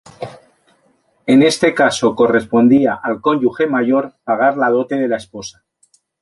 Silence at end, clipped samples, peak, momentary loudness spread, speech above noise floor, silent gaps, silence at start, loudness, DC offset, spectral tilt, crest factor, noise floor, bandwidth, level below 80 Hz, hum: 0.7 s; under 0.1%; 0 dBFS; 19 LU; 45 dB; none; 0.2 s; -15 LUFS; under 0.1%; -5 dB/octave; 14 dB; -59 dBFS; 11.5 kHz; -56 dBFS; none